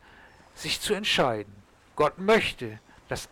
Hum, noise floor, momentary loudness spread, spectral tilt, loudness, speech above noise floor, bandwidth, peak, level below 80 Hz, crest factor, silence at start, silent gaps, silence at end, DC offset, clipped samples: none; -53 dBFS; 16 LU; -3.5 dB/octave; -26 LUFS; 27 dB; 18.5 kHz; -14 dBFS; -54 dBFS; 16 dB; 0.55 s; none; 0.05 s; under 0.1%; under 0.1%